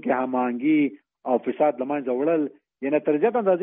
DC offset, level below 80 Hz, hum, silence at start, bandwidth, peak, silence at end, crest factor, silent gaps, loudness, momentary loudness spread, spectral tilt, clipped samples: under 0.1%; -74 dBFS; none; 0.05 s; 3.7 kHz; -8 dBFS; 0 s; 16 dB; none; -24 LUFS; 6 LU; -2 dB/octave; under 0.1%